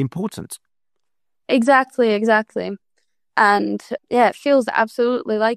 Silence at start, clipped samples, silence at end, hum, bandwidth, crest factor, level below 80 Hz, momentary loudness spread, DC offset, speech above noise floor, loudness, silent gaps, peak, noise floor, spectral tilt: 0 s; under 0.1%; 0 s; none; 13 kHz; 18 dB; -64 dBFS; 14 LU; under 0.1%; 65 dB; -18 LUFS; none; -2 dBFS; -83 dBFS; -5.5 dB/octave